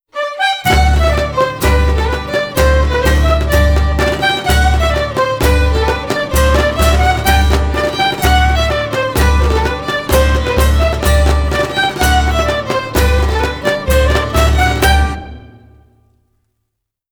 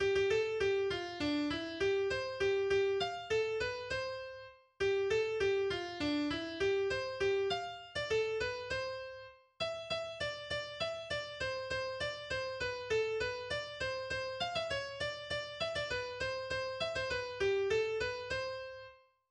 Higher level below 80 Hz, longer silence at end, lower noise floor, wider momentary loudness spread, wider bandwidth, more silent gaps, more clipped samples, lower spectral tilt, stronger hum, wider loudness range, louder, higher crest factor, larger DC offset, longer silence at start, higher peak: first, -16 dBFS vs -60 dBFS; first, 1.7 s vs 0.35 s; first, -73 dBFS vs -57 dBFS; second, 4 LU vs 7 LU; first, over 20 kHz vs 9.8 kHz; neither; neither; about the same, -5 dB/octave vs -4 dB/octave; neither; second, 1 LU vs 4 LU; first, -13 LUFS vs -36 LUFS; about the same, 12 dB vs 14 dB; neither; first, 0.15 s vs 0 s; first, 0 dBFS vs -22 dBFS